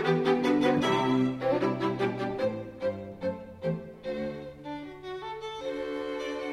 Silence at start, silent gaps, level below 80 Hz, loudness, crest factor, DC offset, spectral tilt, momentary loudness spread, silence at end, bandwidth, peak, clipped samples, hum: 0 s; none; -60 dBFS; -30 LUFS; 16 dB; under 0.1%; -6.5 dB/octave; 14 LU; 0 s; 13 kHz; -14 dBFS; under 0.1%; none